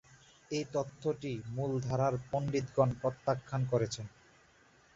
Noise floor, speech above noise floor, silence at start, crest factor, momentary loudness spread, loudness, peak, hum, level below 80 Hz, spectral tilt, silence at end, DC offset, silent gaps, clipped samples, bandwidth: -64 dBFS; 31 dB; 0.1 s; 20 dB; 8 LU; -35 LUFS; -14 dBFS; none; -62 dBFS; -7 dB/octave; 0.9 s; under 0.1%; none; under 0.1%; 7.8 kHz